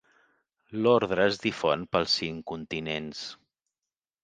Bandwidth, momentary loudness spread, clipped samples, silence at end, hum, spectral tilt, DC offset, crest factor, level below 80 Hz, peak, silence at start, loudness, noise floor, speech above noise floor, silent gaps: 9.4 kHz; 14 LU; under 0.1%; 0.9 s; none; -4.5 dB/octave; under 0.1%; 20 dB; -60 dBFS; -8 dBFS; 0.7 s; -27 LUFS; under -90 dBFS; over 63 dB; none